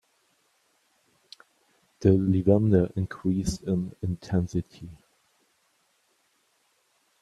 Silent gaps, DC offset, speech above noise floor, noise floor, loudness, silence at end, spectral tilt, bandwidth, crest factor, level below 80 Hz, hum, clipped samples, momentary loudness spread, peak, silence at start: none; under 0.1%; 45 dB; -69 dBFS; -26 LUFS; 2.3 s; -8 dB/octave; 12 kHz; 22 dB; -52 dBFS; none; under 0.1%; 12 LU; -6 dBFS; 2 s